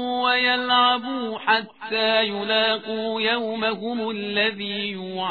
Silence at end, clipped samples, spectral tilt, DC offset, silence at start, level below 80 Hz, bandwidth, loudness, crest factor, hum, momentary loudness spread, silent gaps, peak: 0 s; under 0.1%; -6 dB/octave; 0.1%; 0 s; -66 dBFS; 4.8 kHz; -22 LUFS; 18 dB; none; 9 LU; none; -6 dBFS